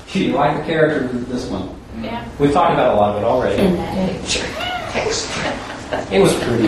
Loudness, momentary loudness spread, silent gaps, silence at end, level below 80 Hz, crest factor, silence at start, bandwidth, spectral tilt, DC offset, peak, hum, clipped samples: -18 LUFS; 12 LU; none; 0 s; -38 dBFS; 16 dB; 0 s; 13 kHz; -5 dB/octave; under 0.1%; 0 dBFS; none; under 0.1%